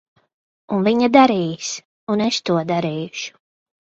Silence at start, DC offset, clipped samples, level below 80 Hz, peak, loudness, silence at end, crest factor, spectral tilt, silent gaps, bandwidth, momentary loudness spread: 0.7 s; under 0.1%; under 0.1%; -62 dBFS; 0 dBFS; -19 LUFS; 0.7 s; 20 dB; -5 dB/octave; 1.85-2.07 s; 8 kHz; 15 LU